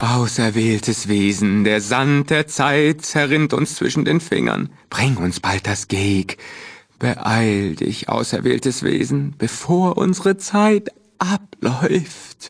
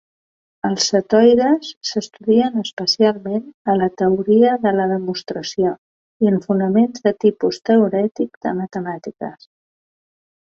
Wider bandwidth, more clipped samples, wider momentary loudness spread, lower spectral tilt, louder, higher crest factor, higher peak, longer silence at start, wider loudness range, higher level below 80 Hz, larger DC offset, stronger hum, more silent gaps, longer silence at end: first, 11 kHz vs 7.6 kHz; neither; second, 7 LU vs 12 LU; about the same, -5 dB/octave vs -5.5 dB/octave; about the same, -18 LUFS vs -18 LUFS; about the same, 18 dB vs 16 dB; about the same, 0 dBFS vs -2 dBFS; second, 0 s vs 0.65 s; about the same, 4 LU vs 2 LU; first, -52 dBFS vs -60 dBFS; neither; neither; second, none vs 1.77-1.81 s, 2.73-2.77 s, 3.54-3.65 s, 5.78-6.20 s, 8.37-8.41 s; second, 0 s vs 1.1 s